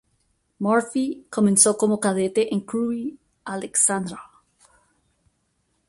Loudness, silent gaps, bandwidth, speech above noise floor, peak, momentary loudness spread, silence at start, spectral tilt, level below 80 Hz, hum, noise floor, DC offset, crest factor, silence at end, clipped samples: -21 LUFS; none; 12 kHz; 49 dB; 0 dBFS; 17 LU; 0.6 s; -4 dB/octave; -66 dBFS; none; -70 dBFS; under 0.1%; 24 dB; 1.65 s; under 0.1%